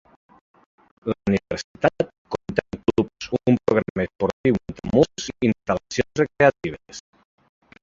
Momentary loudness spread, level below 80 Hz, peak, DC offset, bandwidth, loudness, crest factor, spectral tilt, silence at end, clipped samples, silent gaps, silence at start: 13 LU; -48 dBFS; -2 dBFS; under 0.1%; 7.8 kHz; -23 LUFS; 22 dB; -6 dB/octave; 0.85 s; under 0.1%; 1.64-1.75 s, 2.18-2.25 s, 3.90-3.95 s, 4.33-4.44 s; 1.05 s